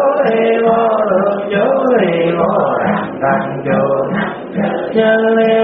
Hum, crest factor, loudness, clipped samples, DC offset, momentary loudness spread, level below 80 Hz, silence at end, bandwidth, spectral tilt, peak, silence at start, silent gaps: none; 12 dB; -14 LUFS; under 0.1%; under 0.1%; 6 LU; -54 dBFS; 0 s; 4.3 kHz; -5 dB/octave; -2 dBFS; 0 s; none